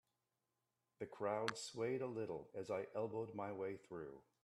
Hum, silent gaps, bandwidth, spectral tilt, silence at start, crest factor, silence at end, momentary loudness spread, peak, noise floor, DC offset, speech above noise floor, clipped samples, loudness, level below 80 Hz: none; none; 13 kHz; -5 dB/octave; 1 s; 26 dB; 0.25 s; 10 LU; -22 dBFS; -90 dBFS; under 0.1%; 44 dB; under 0.1%; -46 LUFS; -84 dBFS